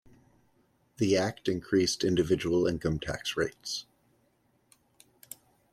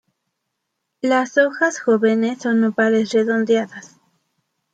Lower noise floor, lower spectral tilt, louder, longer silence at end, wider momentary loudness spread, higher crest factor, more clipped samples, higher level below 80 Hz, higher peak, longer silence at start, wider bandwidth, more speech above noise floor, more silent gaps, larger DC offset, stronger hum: second, -70 dBFS vs -77 dBFS; about the same, -5 dB/octave vs -5 dB/octave; second, -29 LUFS vs -18 LUFS; first, 1.9 s vs 0.85 s; first, 17 LU vs 4 LU; about the same, 18 dB vs 16 dB; neither; first, -56 dBFS vs -72 dBFS; second, -14 dBFS vs -4 dBFS; about the same, 1 s vs 1.05 s; first, 14.5 kHz vs 9 kHz; second, 42 dB vs 59 dB; neither; neither; neither